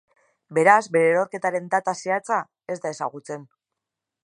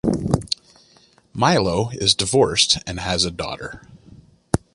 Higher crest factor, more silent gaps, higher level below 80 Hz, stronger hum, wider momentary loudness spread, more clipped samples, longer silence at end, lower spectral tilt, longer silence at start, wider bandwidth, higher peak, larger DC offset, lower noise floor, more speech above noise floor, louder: about the same, 22 dB vs 20 dB; neither; second, -78 dBFS vs -40 dBFS; neither; first, 16 LU vs 13 LU; neither; first, 0.8 s vs 0.15 s; first, -5 dB/octave vs -3.5 dB/octave; first, 0.5 s vs 0.05 s; about the same, 11.5 kHz vs 11.5 kHz; about the same, -2 dBFS vs -2 dBFS; neither; first, -85 dBFS vs -55 dBFS; first, 63 dB vs 35 dB; second, -22 LUFS vs -19 LUFS